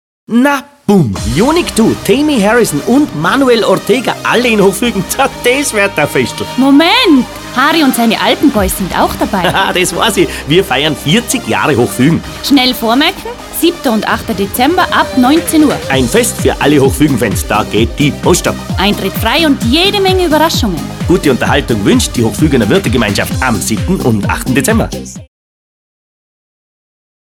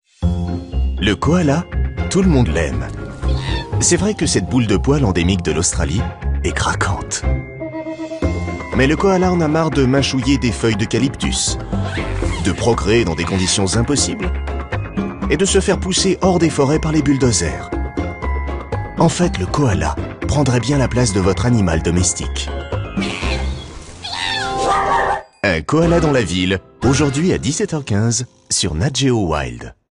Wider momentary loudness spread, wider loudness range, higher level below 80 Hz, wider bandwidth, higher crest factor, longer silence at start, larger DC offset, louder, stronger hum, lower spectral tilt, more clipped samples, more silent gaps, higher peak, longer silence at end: second, 5 LU vs 9 LU; about the same, 2 LU vs 3 LU; about the same, -28 dBFS vs -26 dBFS; first, 18.5 kHz vs 11 kHz; second, 10 dB vs 16 dB; about the same, 0.3 s vs 0.2 s; neither; first, -10 LUFS vs -17 LUFS; neither; about the same, -4.5 dB/octave vs -5 dB/octave; first, 0.2% vs under 0.1%; neither; about the same, 0 dBFS vs -2 dBFS; first, 2.1 s vs 0.25 s